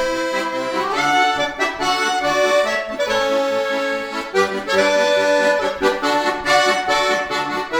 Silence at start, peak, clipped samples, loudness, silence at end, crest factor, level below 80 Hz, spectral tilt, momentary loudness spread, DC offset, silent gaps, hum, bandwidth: 0 s; -2 dBFS; under 0.1%; -18 LUFS; 0 s; 16 dB; -50 dBFS; -2.5 dB/octave; 6 LU; under 0.1%; none; none; over 20 kHz